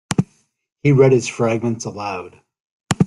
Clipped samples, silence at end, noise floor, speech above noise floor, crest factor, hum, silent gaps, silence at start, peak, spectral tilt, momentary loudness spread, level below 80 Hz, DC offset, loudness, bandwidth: under 0.1%; 0 s; -65 dBFS; 48 dB; 18 dB; none; 0.72-0.76 s, 2.60-2.80 s; 0.1 s; 0 dBFS; -6.5 dB/octave; 14 LU; -54 dBFS; under 0.1%; -18 LUFS; 12 kHz